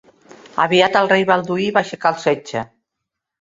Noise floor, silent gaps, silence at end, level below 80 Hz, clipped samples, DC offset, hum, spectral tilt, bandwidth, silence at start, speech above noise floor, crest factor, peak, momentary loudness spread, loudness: -80 dBFS; none; 0.75 s; -60 dBFS; under 0.1%; under 0.1%; none; -5 dB/octave; 7.8 kHz; 0.45 s; 64 dB; 18 dB; -2 dBFS; 13 LU; -17 LUFS